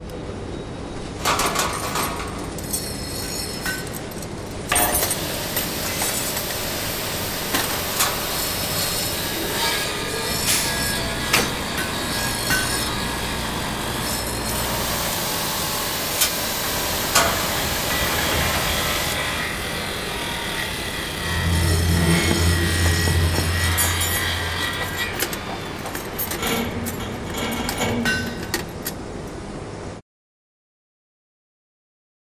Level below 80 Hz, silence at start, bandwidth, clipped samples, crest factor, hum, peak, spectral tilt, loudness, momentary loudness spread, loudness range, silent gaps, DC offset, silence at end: -34 dBFS; 0 s; 16 kHz; under 0.1%; 20 dB; none; -4 dBFS; -3 dB/octave; -22 LUFS; 11 LU; 6 LU; none; under 0.1%; 2.35 s